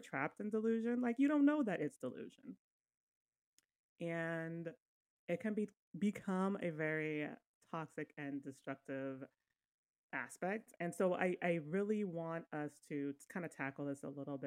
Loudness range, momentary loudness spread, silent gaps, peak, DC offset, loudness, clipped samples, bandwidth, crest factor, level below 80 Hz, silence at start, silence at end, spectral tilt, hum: 8 LU; 12 LU; 2.59-2.85 s, 2.97-3.32 s, 3.38-3.58 s, 3.79-3.96 s, 4.82-5.28 s, 5.77-5.92 s, 7.47-7.61 s, 9.68-10.09 s; -22 dBFS; under 0.1%; -41 LUFS; under 0.1%; 14.5 kHz; 18 dB; -88 dBFS; 0 s; 0 s; -7 dB/octave; none